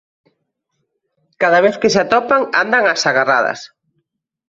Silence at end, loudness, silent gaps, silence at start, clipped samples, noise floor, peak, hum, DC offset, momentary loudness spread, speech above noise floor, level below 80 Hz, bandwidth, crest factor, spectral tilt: 0.85 s; -14 LUFS; none; 1.4 s; under 0.1%; -71 dBFS; 0 dBFS; none; under 0.1%; 5 LU; 57 dB; -60 dBFS; 7.8 kHz; 16 dB; -3.5 dB/octave